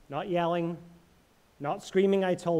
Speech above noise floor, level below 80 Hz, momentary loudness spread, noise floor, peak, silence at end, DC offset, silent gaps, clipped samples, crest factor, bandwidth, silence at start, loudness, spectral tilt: 35 dB; -66 dBFS; 11 LU; -63 dBFS; -14 dBFS; 0 s; under 0.1%; none; under 0.1%; 16 dB; 12.5 kHz; 0.1 s; -29 LUFS; -6.5 dB/octave